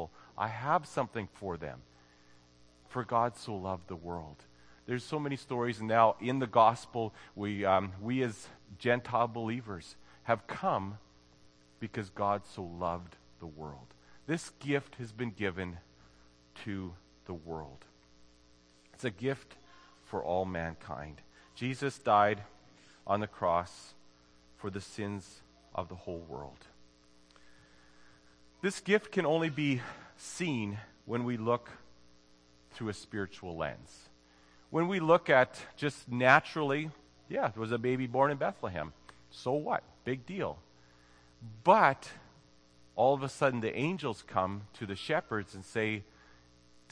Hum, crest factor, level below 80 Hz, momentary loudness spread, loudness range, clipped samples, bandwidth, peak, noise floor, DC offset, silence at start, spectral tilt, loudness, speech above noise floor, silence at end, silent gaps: none; 28 dB; -64 dBFS; 20 LU; 12 LU; under 0.1%; 10.5 kHz; -6 dBFS; -63 dBFS; under 0.1%; 0 s; -6 dB/octave; -33 LUFS; 30 dB; 0.9 s; none